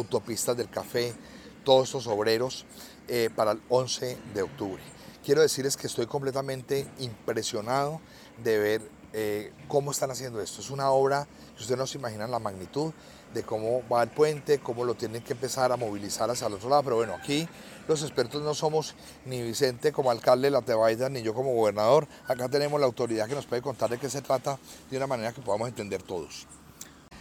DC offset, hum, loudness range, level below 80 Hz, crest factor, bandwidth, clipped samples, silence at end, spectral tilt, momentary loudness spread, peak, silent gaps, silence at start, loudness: under 0.1%; none; 5 LU; -64 dBFS; 22 dB; 17.5 kHz; under 0.1%; 0 s; -4.5 dB/octave; 14 LU; -8 dBFS; none; 0 s; -29 LUFS